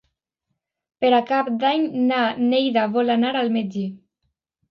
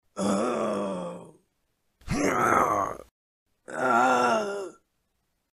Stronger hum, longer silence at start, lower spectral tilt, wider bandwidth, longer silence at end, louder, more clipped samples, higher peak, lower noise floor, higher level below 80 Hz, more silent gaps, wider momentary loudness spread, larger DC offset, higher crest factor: neither; first, 1 s vs 0.15 s; first, -7 dB/octave vs -5 dB/octave; second, 6 kHz vs 15 kHz; about the same, 0.75 s vs 0.85 s; first, -20 LUFS vs -26 LUFS; neither; about the same, -6 dBFS vs -8 dBFS; about the same, -78 dBFS vs -76 dBFS; second, -70 dBFS vs -54 dBFS; second, none vs 3.11-3.46 s; second, 5 LU vs 17 LU; neither; about the same, 16 dB vs 20 dB